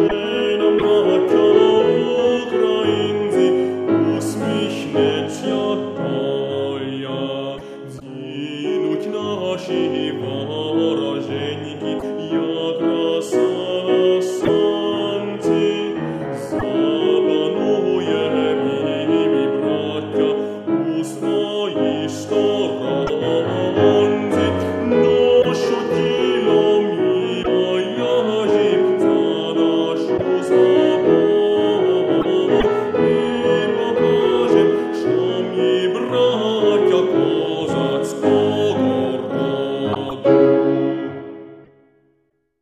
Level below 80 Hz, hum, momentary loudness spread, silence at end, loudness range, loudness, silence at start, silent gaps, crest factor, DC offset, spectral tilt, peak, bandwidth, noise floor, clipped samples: -52 dBFS; none; 9 LU; 1 s; 6 LU; -18 LUFS; 0 s; none; 16 dB; under 0.1%; -6 dB/octave; -2 dBFS; 11.5 kHz; -65 dBFS; under 0.1%